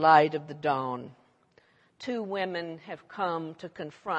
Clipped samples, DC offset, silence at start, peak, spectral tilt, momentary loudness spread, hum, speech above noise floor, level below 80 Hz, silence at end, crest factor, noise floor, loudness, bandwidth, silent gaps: under 0.1%; under 0.1%; 0 s; -6 dBFS; -6.5 dB/octave; 15 LU; none; 36 dB; -78 dBFS; 0 s; 22 dB; -64 dBFS; -30 LUFS; 8 kHz; none